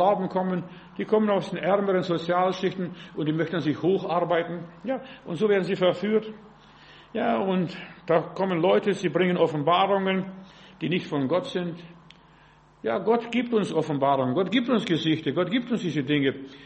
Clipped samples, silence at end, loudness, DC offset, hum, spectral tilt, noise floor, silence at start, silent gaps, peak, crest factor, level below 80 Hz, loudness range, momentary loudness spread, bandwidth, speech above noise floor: under 0.1%; 0 s; -25 LUFS; under 0.1%; none; -7 dB/octave; -55 dBFS; 0 s; none; -8 dBFS; 18 dB; -66 dBFS; 3 LU; 11 LU; 8.4 kHz; 30 dB